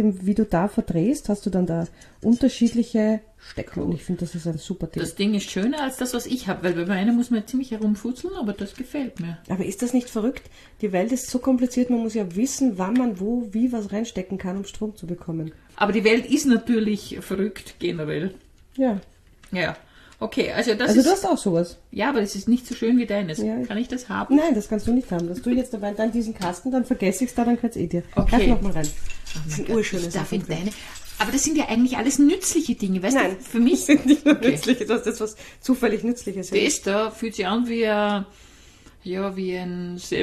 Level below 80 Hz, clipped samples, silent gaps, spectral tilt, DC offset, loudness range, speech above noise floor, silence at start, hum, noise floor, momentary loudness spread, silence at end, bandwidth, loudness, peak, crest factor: -40 dBFS; under 0.1%; none; -5 dB/octave; under 0.1%; 6 LU; 27 dB; 0 s; none; -49 dBFS; 11 LU; 0 s; 13 kHz; -23 LUFS; -4 dBFS; 18 dB